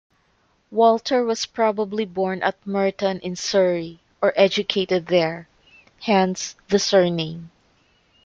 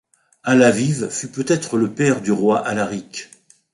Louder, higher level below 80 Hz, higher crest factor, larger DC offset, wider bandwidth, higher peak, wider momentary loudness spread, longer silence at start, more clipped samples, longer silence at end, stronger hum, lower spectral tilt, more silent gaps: about the same, -21 LUFS vs -19 LUFS; about the same, -60 dBFS vs -58 dBFS; about the same, 18 dB vs 16 dB; neither; second, 7.8 kHz vs 11.5 kHz; about the same, -4 dBFS vs -2 dBFS; second, 11 LU vs 15 LU; first, 0.7 s vs 0.45 s; neither; first, 0.75 s vs 0.5 s; neither; about the same, -4.5 dB/octave vs -5 dB/octave; neither